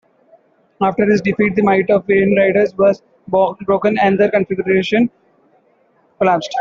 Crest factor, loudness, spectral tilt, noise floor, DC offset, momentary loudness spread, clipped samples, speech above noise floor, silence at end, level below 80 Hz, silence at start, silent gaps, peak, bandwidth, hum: 14 dB; -15 LUFS; -7 dB/octave; -56 dBFS; under 0.1%; 5 LU; under 0.1%; 42 dB; 0 s; -54 dBFS; 0.8 s; none; -2 dBFS; 7.2 kHz; none